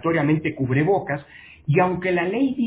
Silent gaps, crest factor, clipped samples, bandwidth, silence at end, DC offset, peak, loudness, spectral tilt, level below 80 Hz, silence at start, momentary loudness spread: none; 16 dB; under 0.1%; 4 kHz; 0 s; under 0.1%; -4 dBFS; -22 LUFS; -11.5 dB/octave; -52 dBFS; 0.05 s; 9 LU